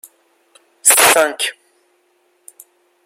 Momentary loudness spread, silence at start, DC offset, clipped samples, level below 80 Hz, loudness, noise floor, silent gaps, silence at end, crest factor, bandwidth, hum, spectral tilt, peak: 13 LU; 0.85 s; under 0.1%; under 0.1%; -68 dBFS; -12 LUFS; -60 dBFS; none; 1.55 s; 18 dB; over 20 kHz; none; 1 dB/octave; 0 dBFS